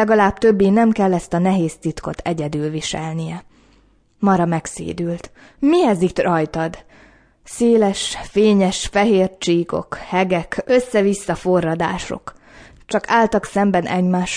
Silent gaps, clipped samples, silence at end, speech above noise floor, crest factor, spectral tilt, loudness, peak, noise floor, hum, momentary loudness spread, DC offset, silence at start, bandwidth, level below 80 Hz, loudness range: none; under 0.1%; 0 s; 37 dB; 16 dB; -5.5 dB/octave; -18 LUFS; -2 dBFS; -55 dBFS; none; 11 LU; under 0.1%; 0 s; 11 kHz; -44 dBFS; 5 LU